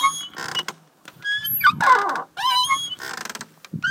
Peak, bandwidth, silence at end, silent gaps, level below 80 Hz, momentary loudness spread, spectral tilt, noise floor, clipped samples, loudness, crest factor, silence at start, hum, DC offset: -4 dBFS; 17 kHz; 0 s; none; -66 dBFS; 16 LU; -1 dB/octave; -48 dBFS; under 0.1%; -21 LUFS; 20 dB; 0 s; none; under 0.1%